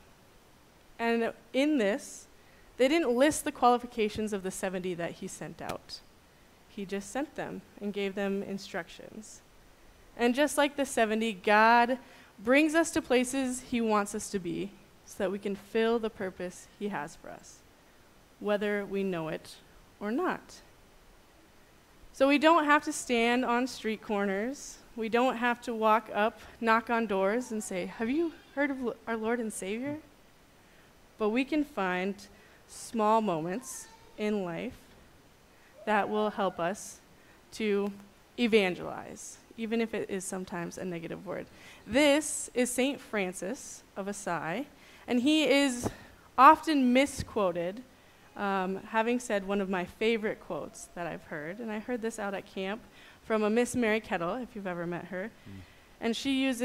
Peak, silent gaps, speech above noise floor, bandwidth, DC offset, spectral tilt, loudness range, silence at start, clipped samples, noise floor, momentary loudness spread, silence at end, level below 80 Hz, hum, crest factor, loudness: -6 dBFS; none; 29 dB; 16 kHz; under 0.1%; -4 dB/octave; 9 LU; 1 s; under 0.1%; -59 dBFS; 16 LU; 0 s; -62 dBFS; none; 24 dB; -30 LUFS